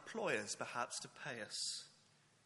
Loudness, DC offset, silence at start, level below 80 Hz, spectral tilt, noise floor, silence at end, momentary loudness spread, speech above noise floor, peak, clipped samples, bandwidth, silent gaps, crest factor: -43 LUFS; under 0.1%; 0 s; -90 dBFS; -1.5 dB/octave; -72 dBFS; 0.5 s; 8 LU; 27 dB; -24 dBFS; under 0.1%; 11.5 kHz; none; 22 dB